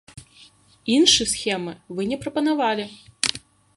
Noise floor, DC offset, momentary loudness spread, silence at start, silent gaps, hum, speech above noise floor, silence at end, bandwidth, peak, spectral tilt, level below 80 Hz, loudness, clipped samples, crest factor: -52 dBFS; under 0.1%; 17 LU; 0.15 s; none; none; 31 dB; 0.4 s; 11.5 kHz; -2 dBFS; -2.5 dB/octave; -54 dBFS; -21 LUFS; under 0.1%; 22 dB